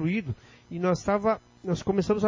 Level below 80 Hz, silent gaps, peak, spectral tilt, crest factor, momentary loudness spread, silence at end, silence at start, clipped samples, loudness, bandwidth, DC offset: -52 dBFS; none; -12 dBFS; -7 dB/octave; 16 dB; 13 LU; 0 s; 0 s; under 0.1%; -28 LUFS; 7.6 kHz; under 0.1%